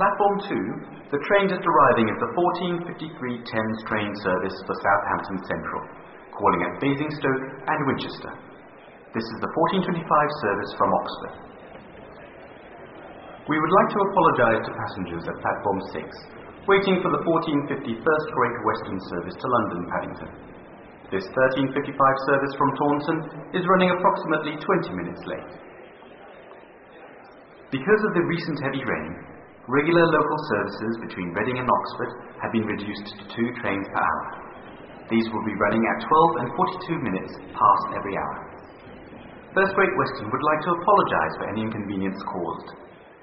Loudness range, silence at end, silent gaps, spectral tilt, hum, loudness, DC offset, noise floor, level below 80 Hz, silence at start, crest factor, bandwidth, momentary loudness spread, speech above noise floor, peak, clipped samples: 5 LU; 0.15 s; none; -4.5 dB/octave; none; -24 LUFS; under 0.1%; -47 dBFS; -56 dBFS; 0 s; 20 dB; 5.8 kHz; 22 LU; 23 dB; -4 dBFS; under 0.1%